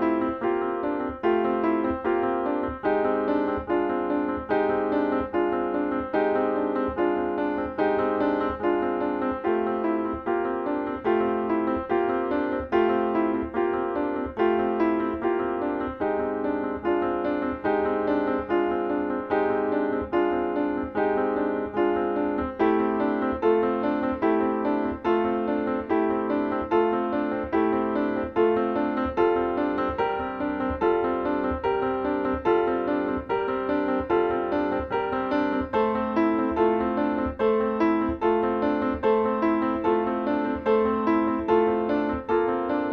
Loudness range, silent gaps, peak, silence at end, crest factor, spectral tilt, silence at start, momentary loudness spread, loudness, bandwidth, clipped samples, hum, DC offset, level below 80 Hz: 2 LU; none; -10 dBFS; 0 s; 14 dB; -8.5 dB/octave; 0 s; 4 LU; -25 LUFS; 5.6 kHz; under 0.1%; none; under 0.1%; -48 dBFS